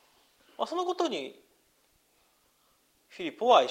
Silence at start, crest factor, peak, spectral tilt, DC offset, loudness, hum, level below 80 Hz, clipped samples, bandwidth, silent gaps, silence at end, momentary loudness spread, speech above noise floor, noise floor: 0.6 s; 24 dB; -8 dBFS; -3 dB/octave; under 0.1%; -30 LUFS; none; -80 dBFS; under 0.1%; 15.5 kHz; none; 0 s; 18 LU; 41 dB; -69 dBFS